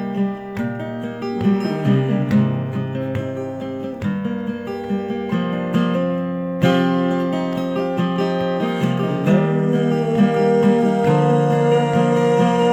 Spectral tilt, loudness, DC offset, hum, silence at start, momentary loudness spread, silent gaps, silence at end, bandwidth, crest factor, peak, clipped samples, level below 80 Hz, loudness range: -8 dB/octave; -19 LUFS; under 0.1%; none; 0 s; 10 LU; none; 0 s; 12 kHz; 16 dB; -4 dBFS; under 0.1%; -54 dBFS; 6 LU